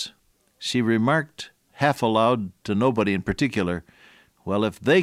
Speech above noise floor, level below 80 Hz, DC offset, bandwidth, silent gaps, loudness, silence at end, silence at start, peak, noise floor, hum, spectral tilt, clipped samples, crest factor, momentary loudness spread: 41 dB; -52 dBFS; under 0.1%; 15 kHz; none; -23 LUFS; 0 s; 0 s; -6 dBFS; -63 dBFS; none; -6 dB/octave; under 0.1%; 18 dB; 14 LU